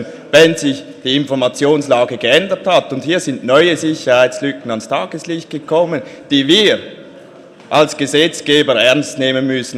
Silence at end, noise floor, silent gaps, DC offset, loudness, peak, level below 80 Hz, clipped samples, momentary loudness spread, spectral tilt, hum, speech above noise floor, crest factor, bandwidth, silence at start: 0 s; -38 dBFS; none; under 0.1%; -14 LUFS; 0 dBFS; -60 dBFS; under 0.1%; 10 LU; -4 dB/octave; none; 25 dB; 14 dB; 15.5 kHz; 0 s